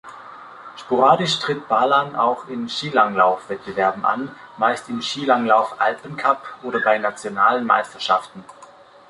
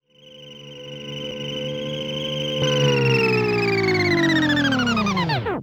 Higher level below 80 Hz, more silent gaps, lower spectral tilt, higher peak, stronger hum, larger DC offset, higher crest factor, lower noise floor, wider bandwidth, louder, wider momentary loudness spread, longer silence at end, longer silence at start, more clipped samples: second, -64 dBFS vs -50 dBFS; neither; second, -4 dB/octave vs -5.5 dB/octave; first, -2 dBFS vs -6 dBFS; neither; neither; about the same, 18 dB vs 14 dB; about the same, -46 dBFS vs -45 dBFS; second, 11.5 kHz vs over 20 kHz; about the same, -20 LUFS vs -20 LUFS; second, 12 LU vs 17 LU; first, 0.45 s vs 0 s; second, 0.05 s vs 0.25 s; neither